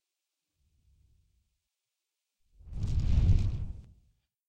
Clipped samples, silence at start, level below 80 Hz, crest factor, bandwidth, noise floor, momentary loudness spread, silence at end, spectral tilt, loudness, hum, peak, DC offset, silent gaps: under 0.1%; 2.65 s; -36 dBFS; 20 dB; 8 kHz; -87 dBFS; 19 LU; 0.65 s; -8 dB/octave; -31 LUFS; none; -12 dBFS; under 0.1%; none